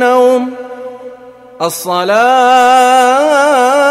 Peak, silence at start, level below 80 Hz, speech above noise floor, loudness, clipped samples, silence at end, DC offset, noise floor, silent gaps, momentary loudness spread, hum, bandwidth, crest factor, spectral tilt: 0 dBFS; 0 s; -60 dBFS; 26 dB; -9 LUFS; under 0.1%; 0 s; under 0.1%; -34 dBFS; none; 19 LU; 60 Hz at -45 dBFS; 16 kHz; 10 dB; -2.5 dB/octave